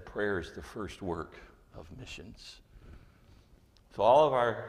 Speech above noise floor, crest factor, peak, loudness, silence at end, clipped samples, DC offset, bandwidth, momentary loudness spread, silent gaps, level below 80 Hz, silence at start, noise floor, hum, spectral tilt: 30 dB; 22 dB; -12 dBFS; -29 LUFS; 0 s; under 0.1%; under 0.1%; 12 kHz; 26 LU; none; -56 dBFS; 0 s; -61 dBFS; none; -5.5 dB/octave